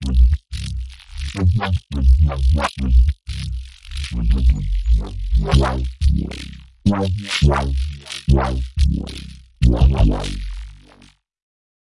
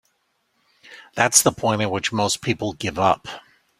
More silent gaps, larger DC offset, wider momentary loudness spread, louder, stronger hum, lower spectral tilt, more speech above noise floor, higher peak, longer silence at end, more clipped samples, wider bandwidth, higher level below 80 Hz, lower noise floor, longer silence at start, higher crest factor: neither; first, 0.6% vs under 0.1%; about the same, 15 LU vs 15 LU; about the same, -20 LUFS vs -20 LUFS; neither; first, -6.5 dB/octave vs -3 dB/octave; second, 34 dB vs 48 dB; about the same, -2 dBFS vs 0 dBFS; first, 0.8 s vs 0.4 s; neither; second, 11.5 kHz vs 16 kHz; first, -20 dBFS vs -56 dBFS; second, -51 dBFS vs -69 dBFS; second, 0 s vs 0.9 s; second, 16 dB vs 24 dB